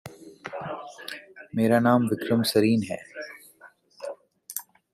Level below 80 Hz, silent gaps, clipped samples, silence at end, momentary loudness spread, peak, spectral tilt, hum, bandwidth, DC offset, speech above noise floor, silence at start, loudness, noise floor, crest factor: -68 dBFS; none; under 0.1%; 0.3 s; 20 LU; -8 dBFS; -5.5 dB/octave; none; 15.5 kHz; under 0.1%; 32 dB; 0.05 s; -25 LUFS; -54 dBFS; 20 dB